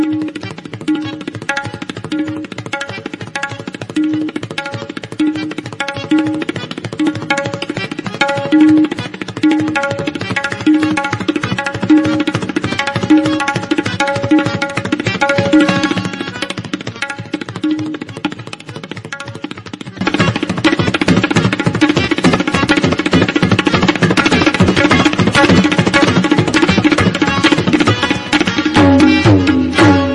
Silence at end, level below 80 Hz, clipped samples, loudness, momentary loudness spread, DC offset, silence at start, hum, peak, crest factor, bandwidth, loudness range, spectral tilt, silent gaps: 0 s; -44 dBFS; under 0.1%; -14 LUFS; 14 LU; under 0.1%; 0 s; none; 0 dBFS; 14 dB; 11.5 kHz; 10 LU; -5.5 dB/octave; none